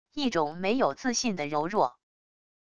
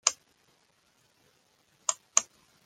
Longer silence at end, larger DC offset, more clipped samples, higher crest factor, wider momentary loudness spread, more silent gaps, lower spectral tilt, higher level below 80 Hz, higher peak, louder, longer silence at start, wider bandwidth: first, 0.65 s vs 0.45 s; first, 0.4% vs under 0.1%; neither; second, 18 dB vs 34 dB; second, 3 LU vs 21 LU; neither; first, -3.5 dB/octave vs 3 dB/octave; first, -62 dBFS vs -84 dBFS; second, -12 dBFS vs -2 dBFS; about the same, -28 LUFS vs -29 LUFS; about the same, 0.05 s vs 0.05 s; second, 11 kHz vs 16.5 kHz